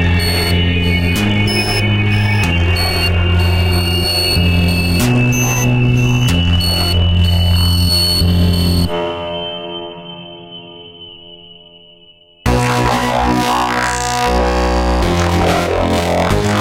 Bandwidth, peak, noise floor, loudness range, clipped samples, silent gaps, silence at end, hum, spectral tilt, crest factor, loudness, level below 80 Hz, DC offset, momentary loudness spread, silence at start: 16.5 kHz; -2 dBFS; -45 dBFS; 8 LU; under 0.1%; none; 0 s; none; -5 dB/octave; 12 dB; -14 LUFS; -24 dBFS; under 0.1%; 13 LU; 0 s